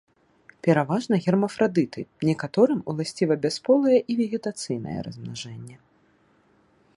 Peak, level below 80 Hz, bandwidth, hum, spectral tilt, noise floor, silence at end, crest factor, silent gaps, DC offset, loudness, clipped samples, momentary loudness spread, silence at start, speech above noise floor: -6 dBFS; -64 dBFS; 11.5 kHz; none; -6.5 dB/octave; -62 dBFS; 1.2 s; 20 dB; none; under 0.1%; -24 LUFS; under 0.1%; 14 LU; 0.65 s; 39 dB